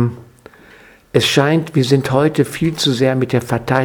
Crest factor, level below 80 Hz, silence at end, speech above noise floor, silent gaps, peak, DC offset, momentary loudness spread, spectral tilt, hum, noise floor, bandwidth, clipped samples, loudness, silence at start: 16 dB; -48 dBFS; 0 s; 30 dB; none; 0 dBFS; under 0.1%; 5 LU; -5.5 dB/octave; none; -45 dBFS; 18.5 kHz; under 0.1%; -16 LUFS; 0 s